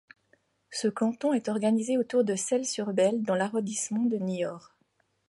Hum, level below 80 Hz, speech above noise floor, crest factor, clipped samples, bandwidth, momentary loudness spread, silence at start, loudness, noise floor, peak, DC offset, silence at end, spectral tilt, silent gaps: none; -78 dBFS; 45 dB; 16 dB; under 0.1%; 11.5 kHz; 6 LU; 0.7 s; -28 LUFS; -72 dBFS; -14 dBFS; under 0.1%; 0.7 s; -4.5 dB/octave; none